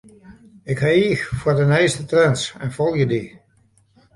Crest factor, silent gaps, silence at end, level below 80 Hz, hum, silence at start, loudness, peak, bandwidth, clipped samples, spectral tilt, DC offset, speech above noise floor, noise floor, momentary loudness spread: 18 dB; none; 0.85 s; -48 dBFS; none; 0.3 s; -19 LUFS; -4 dBFS; 11.5 kHz; under 0.1%; -6 dB/octave; under 0.1%; 40 dB; -58 dBFS; 10 LU